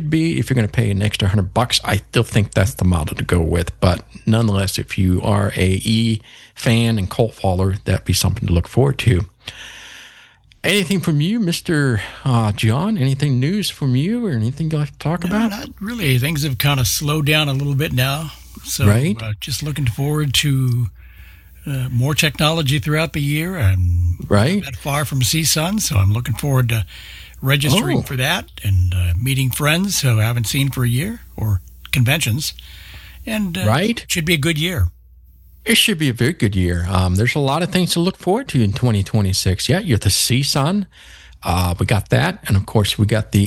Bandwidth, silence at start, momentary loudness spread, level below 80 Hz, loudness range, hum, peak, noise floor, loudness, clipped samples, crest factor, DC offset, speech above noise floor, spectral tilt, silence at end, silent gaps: 17 kHz; 0 s; 7 LU; -36 dBFS; 2 LU; none; -2 dBFS; -48 dBFS; -18 LUFS; under 0.1%; 16 dB; under 0.1%; 31 dB; -5 dB/octave; 0 s; none